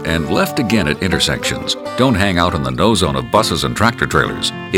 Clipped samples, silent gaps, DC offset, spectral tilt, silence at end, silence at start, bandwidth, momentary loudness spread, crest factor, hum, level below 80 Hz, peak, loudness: under 0.1%; none; under 0.1%; -4.5 dB/octave; 0 s; 0 s; 18 kHz; 4 LU; 16 dB; none; -34 dBFS; 0 dBFS; -15 LUFS